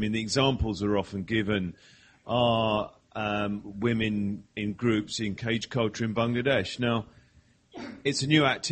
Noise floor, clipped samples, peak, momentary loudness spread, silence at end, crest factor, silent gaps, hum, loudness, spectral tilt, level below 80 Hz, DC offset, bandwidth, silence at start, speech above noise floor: -61 dBFS; under 0.1%; -8 dBFS; 10 LU; 0 s; 20 dB; none; none; -28 LUFS; -5 dB/octave; -50 dBFS; under 0.1%; 8.8 kHz; 0 s; 34 dB